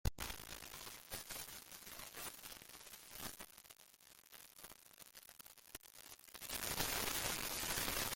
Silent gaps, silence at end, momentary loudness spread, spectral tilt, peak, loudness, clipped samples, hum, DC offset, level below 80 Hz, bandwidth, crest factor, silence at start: none; 0 s; 19 LU; -1.5 dB/octave; -22 dBFS; -44 LUFS; under 0.1%; none; under 0.1%; -58 dBFS; 17 kHz; 26 dB; 0.05 s